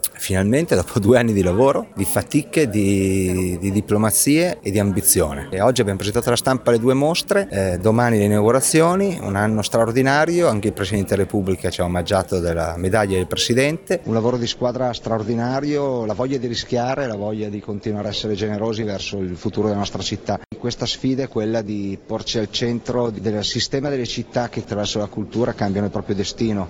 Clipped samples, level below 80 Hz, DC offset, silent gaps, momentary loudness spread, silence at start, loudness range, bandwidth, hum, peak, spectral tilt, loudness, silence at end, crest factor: under 0.1%; -44 dBFS; under 0.1%; none; 9 LU; 0.05 s; 6 LU; 19 kHz; none; -2 dBFS; -5 dB/octave; -20 LUFS; 0 s; 18 dB